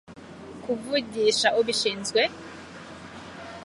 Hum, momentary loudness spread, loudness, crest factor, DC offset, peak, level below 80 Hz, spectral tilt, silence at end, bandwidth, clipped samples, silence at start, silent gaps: none; 20 LU; -24 LUFS; 22 dB; under 0.1%; -6 dBFS; -62 dBFS; -2 dB/octave; 0 s; 11.5 kHz; under 0.1%; 0.1 s; none